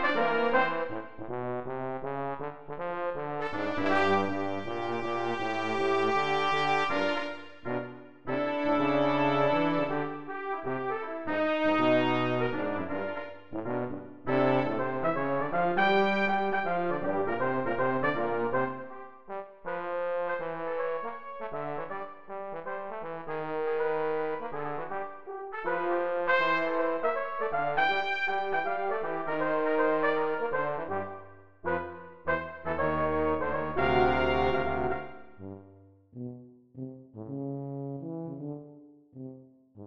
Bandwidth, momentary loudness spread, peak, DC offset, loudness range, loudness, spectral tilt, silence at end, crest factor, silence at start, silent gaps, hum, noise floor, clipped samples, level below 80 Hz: 8.8 kHz; 14 LU; -12 dBFS; 0.8%; 7 LU; -30 LUFS; -6.5 dB/octave; 0 s; 20 dB; 0 s; none; none; -56 dBFS; under 0.1%; -56 dBFS